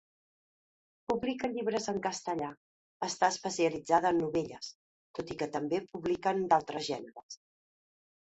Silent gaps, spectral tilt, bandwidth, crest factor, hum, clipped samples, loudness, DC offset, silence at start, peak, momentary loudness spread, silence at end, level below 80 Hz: 2.57-3.00 s, 4.75-5.14 s, 7.23-7.29 s; -4 dB/octave; 8.4 kHz; 22 dB; none; under 0.1%; -33 LUFS; under 0.1%; 1.1 s; -12 dBFS; 17 LU; 1 s; -68 dBFS